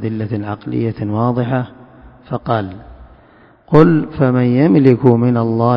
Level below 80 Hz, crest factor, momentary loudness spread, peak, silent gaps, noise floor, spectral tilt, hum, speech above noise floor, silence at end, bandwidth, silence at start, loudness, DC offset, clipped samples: -44 dBFS; 14 dB; 12 LU; 0 dBFS; none; -47 dBFS; -11 dB/octave; none; 33 dB; 0 s; 5.4 kHz; 0 s; -14 LUFS; under 0.1%; 0.3%